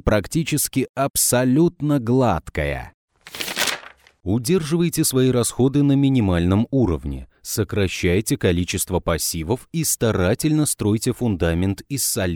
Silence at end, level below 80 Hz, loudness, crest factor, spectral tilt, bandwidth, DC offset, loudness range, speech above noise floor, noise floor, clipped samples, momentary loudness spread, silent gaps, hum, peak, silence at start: 0 s; -38 dBFS; -20 LUFS; 18 dB; -5 dB/octave; over 20 kHz; under 0.1%; 3 LU; 23 dB; -43 dBFS; under 0.1%; 8 LU; 0.89-0.94 s, 1.10-1.14 s, 2.94-3.08 s; none; -2 dBFS; 0.05 s